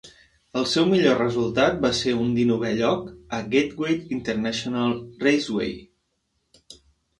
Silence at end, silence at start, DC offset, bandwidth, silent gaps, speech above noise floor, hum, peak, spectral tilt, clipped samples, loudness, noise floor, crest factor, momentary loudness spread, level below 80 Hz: 0.45 s; 0.05 s; under 0.1%; 11.5 kHz; none; 51 dB; none; -6 dBFS; -5 dB/octave; under 0.1%; -23 LUFS; -73 dBFS; 18 dB; 9 LU; -54 dBFS